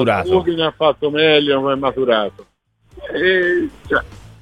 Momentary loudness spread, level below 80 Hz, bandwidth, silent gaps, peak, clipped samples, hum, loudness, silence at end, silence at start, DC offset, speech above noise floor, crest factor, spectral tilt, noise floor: 10 LU; -44 dBFS; 9.8 kHz; none; -2 dBFS; under 0.1%; none; -16 LUFS; 0.15 s; 0 s; under 0.1%; 29 dB; 16 dB; -6.5 dB/octave; -45 dBFS